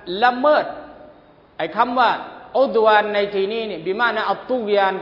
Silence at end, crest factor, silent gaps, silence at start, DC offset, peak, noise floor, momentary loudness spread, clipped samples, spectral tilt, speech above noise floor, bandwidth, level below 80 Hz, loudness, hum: 0 s; 18 dB; none; 0 s; under 0.1%; -2 dBFS; -49 dBFS; 11 LU; under 0.1%; -6.5 dB/octave; 30 dB; 5.8 kHz; -60 dBFS; -19 LUFS; none